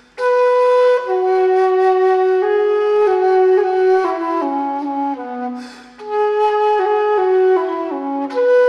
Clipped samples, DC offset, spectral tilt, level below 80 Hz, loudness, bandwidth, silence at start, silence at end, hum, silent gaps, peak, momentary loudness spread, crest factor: under 0.1%; under 0.1%; -4.5 dB/octave; -66 dBFS; -16 LUFS; 9.6 kHz; 0.15 s; 0 s; none; none; -4 dBFS; 9 LU; 10 dB